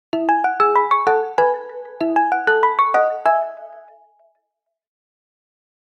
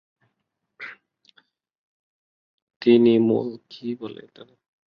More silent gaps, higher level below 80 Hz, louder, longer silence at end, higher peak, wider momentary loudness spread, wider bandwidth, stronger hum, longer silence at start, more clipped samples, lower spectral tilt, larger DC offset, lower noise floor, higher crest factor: second, none vs 1.78-2.67 s, 2.76-2.80 s; about the same, -70 dBFS vs -72 dBFS; first, -17 LUFS vs -20 LUFS; first, 2 s vs 0.5 s; about the same, -6 dBFS vs -4 dBFS; second, 10 LU vs 23 LU; first, 10 kHz vs 5.6 kHz; neither; second, 0.15 s vs 0.8 s; neither; second, -5 dB/octave vs -9 dB/octave; neither; about the same, -78 dBFS vs -79 dBFS; second, 14 dB vs 20 dB